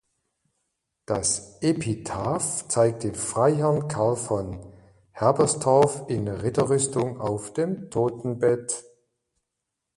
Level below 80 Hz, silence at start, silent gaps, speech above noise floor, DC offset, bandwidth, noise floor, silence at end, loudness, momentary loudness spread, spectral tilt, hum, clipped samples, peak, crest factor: -54 dBFS; 1.1 s; none; 59 dB; under 0.1%; 11.5 kHz; -83 dBFS; 1.15 s; -25 LUFS; 8 LU; -5 dB/octave; none; under 0.1%; -6 dBFS; 20 dB